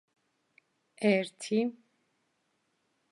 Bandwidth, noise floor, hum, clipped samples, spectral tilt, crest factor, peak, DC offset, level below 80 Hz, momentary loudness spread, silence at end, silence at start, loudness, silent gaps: 11.5 kHz; -77 dBFS; none; under 0.1%; -5.5 dB/octave; 22 dB; -14 dBFS; under 0.1%; -88 dBFS; 5 LU; 1.4 s; 1 s; -30 LUFS; none